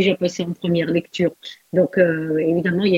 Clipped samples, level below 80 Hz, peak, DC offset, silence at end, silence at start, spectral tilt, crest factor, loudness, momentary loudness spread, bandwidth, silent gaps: under 0.1%; -58 dBFS; -4 dBFS; under 0.1%; 0 s; 0 s; -6.5 dB/octave; 16 dB; -20 LUFS; 6 LU; 7.8 kHz; none